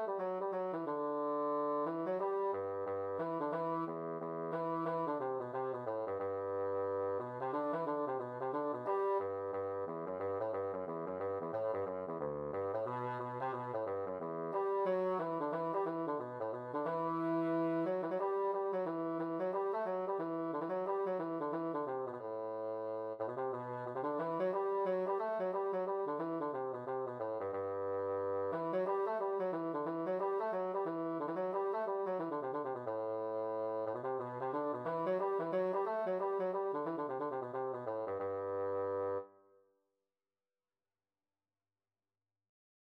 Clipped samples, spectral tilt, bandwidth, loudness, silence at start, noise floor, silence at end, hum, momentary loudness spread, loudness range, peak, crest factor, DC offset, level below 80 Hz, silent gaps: under 0.1%; -9 dB/octave; 5.6 kHz; -38 LUFS; 0 s; under -90 dBFS; 3.55 s; none; 5 LU; 3 LU; -26 dBFS; 12 dB; under 0.1%; -84 dBFS; none